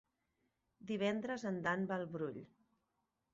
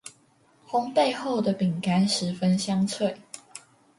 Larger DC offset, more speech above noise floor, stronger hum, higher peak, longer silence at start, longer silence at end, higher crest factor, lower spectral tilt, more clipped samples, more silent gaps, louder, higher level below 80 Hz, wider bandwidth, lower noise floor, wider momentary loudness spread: neither; first, 46 dB vs 37 dB; neither; second, -22 dBFS vs -10 dBFS; first, 0.8 s vs 0.05 s; first, 0.9 s vs 0.4 s; first, 22 dB vs 16 dB; about the same, -5 dB/octave vs -5.5 dB/octave; neither; neither; second, -40 LUFS vs -25 LUFS; second, -78 dBFS vs -68 dBFS; second, 7.6 kHz vs 11.5 kHz; first, -86 dBFS vs -61 dBFS; second, 10 LU vs 18 LU